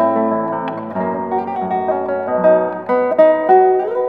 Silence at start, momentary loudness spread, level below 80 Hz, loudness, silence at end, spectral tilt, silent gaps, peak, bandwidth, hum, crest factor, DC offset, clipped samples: 0 s; 10 LU; -66 dBFS; -16 LUFS; 0 s; -9.5 dB/octave; none; 0 dBFS; 4.4 kHz; none; 14 dB; 0.1%; under 0.1%